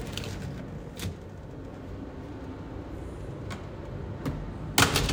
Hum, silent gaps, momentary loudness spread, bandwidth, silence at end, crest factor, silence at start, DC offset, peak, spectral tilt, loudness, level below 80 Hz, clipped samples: none; none; 16 LU; 18 kHz; 0 s; 28 dB; 0 s; under 0.1%; -4 dBFS; -3.5 dB/octave; -33 LUFS; -44 dBFS; under 0.1%